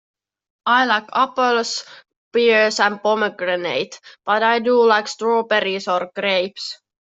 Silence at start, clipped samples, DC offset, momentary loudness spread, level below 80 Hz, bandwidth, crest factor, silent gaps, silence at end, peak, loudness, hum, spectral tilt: 0.65 s; under 0.1%; under 0.1%; 11 LU; -72 dBFS; 8 kHz; 18 dB; 2.16-2.31 s; 0.3 s; -2 dBFS; -18 LUFS; none; -3 dB/octave